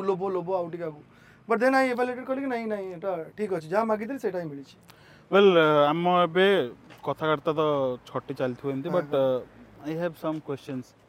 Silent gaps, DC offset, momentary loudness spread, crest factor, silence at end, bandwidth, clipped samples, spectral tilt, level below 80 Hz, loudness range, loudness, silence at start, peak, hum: none; under 0.1%; 14 LU; 18 dB; 0.25 s; 15.5 kHz; under 0.1%; -6.5 dB/octave; -68 dBFS; 6 LU; -26 LUFS; 0 s; -8 dBFS; none